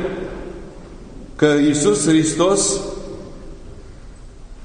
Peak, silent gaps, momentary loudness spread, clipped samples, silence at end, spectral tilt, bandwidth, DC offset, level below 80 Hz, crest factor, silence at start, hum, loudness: -2 dBFS; none; 24 LU; under 0.1%; 0 s; -4 dB/octave; 10.5 kHz; under 0.1%; -38 dBFS; 18 dB; 0 s; none; -17 LUFS